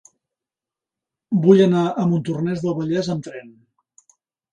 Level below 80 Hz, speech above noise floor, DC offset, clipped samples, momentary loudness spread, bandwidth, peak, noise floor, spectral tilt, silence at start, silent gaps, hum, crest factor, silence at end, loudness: -64 dBFS; 70 dB; under 0.1%; under 0.1%; 14 LU; 9.4 kHz; -2 dBFS; -89 dBFS; -8 dB/octave; 1.3 s; none; none; 20 dB; 1.05 s; -19 LUFS